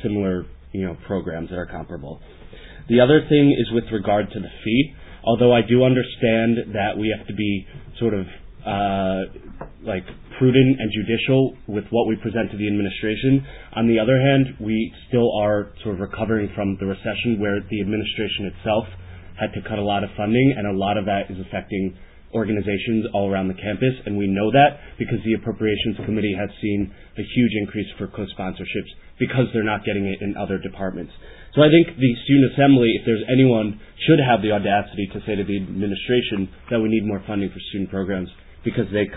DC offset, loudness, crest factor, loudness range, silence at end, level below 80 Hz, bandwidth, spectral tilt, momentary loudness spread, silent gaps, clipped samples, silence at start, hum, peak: under 0.1%; -21 LUFS; 18 dB; 7 LU; 0 s; -44 dBFS; 4 kHz; -11 dB/octave; 14 LU; none; under 0.1%; 0 s; none; -2 dBFS